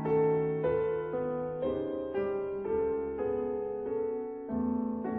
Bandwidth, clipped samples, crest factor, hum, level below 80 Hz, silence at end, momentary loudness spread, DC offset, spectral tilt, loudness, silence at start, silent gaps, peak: 3.8 kHz; under 0.1%; 14 dB; none; -58 dBFS; 0 s; 6 LU; under 0.1%; -11 dB/octave; -32 LUFS; 0 s; none; -18 dBFS